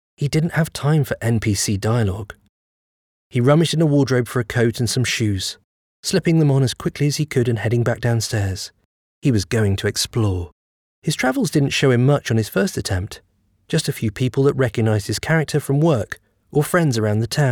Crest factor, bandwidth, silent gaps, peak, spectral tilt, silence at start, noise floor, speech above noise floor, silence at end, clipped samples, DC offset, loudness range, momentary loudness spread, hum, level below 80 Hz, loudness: 14 dB; 18.5 kHz; 2.49-3.31 s, 5.64-6.03 s, 8.85-9.22 s, 10.52-11.02 s; -4 dBFS; -5.5 dB/octave; 0.2 s; under -90 dBFS; over 72 dB; 0 s; under 0.1%; under 0.1%; 2 LU; 9 LU; none; -48 dBFS; -19 LUFS